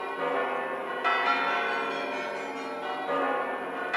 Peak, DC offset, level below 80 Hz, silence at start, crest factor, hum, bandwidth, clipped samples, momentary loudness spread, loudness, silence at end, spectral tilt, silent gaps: -14 dBFS; under 0.1%; -84 dBFS; 0 s; 16 dB; none; 15.5 kHz; under 0.1%; 8 LU; -29 LUFS; 0 s; -3.5 dB/octave; none